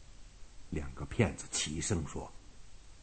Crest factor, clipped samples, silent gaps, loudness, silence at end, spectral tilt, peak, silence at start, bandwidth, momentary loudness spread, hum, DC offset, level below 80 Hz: 26 dB; under 0.1%; none; -36 LUFS; 0 s; -4 dB/octave; -12 dBFS; 0 s; 9.2 kHz; 11 LU; none; under 0.1%; -50 dBFS